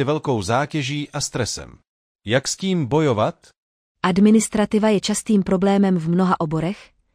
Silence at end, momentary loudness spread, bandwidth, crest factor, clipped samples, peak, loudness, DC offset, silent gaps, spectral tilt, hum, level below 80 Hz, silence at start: 0.3 s; 8 LU; 14 kHz; 14 dB; under 0.1%; -6 dBFS; -20 LUFS; under 0.1%; 1.89-2.19 s, 3.57-3.95 s; -5.5 dB/octave; none; -50 dBFS; 0 s